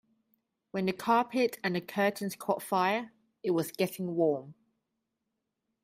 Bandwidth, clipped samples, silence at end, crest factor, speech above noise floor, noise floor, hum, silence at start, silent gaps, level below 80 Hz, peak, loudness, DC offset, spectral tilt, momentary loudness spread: 16 kHz; under 0.1%; 1.3 s; 20 dB; 54 dB; -84 dBFS; none; 0.75 s; none; -76 dBFS; -14 dBFS; -31 LUFS; under 0.1%; -5.5 dB/octave; 9 LU